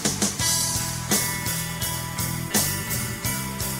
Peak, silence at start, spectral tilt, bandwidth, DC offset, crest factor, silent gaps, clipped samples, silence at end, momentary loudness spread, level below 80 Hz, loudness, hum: -8 dBFS; 0 s; -2.5 dB/octave; 16.5 kHz; under 0.1%; 18 dB; none; under 0.1%; 0 s; 6 LU; -44 dBFS; -24 LUFS; none